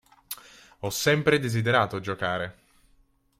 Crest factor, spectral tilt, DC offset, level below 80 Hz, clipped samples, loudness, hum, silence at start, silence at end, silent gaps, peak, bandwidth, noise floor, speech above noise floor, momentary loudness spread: 20 dB; -4.5 dB/octave; under 0.1%; -60 dBFS; under 0.1%; -25 LUFS; none; 0.3 s; 0.9 s; none; -8 dBFS; 16.5 kHz; -63 dBFS; 38 dB; 17 LU